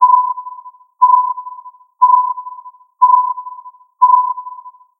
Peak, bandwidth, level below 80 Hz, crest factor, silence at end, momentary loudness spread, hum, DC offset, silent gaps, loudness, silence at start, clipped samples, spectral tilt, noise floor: 0 dBFS; 1.2 kHz; under -90 dBFS; 14 dB; 0.3 s; 21 LU; none; under 0.1%; none; -13 LUFS; 0 s; under 0.1%; 0 dB/octave; -36 dBFS